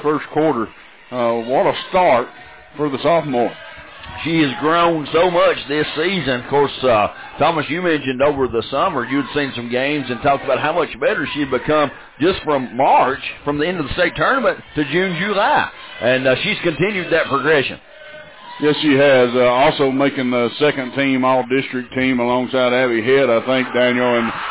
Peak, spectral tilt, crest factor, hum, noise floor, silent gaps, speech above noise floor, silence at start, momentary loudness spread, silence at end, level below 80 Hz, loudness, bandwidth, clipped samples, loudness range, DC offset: -4 dBFS; -9.5 dB/octave; 12 dB; none; -38 dBFS; none; 21 dB; 0 s; 8 LU; 0 s; -48 dBFS; -17 LUFS; 4 kHz; under 0.1%; 3 LU; 0.2%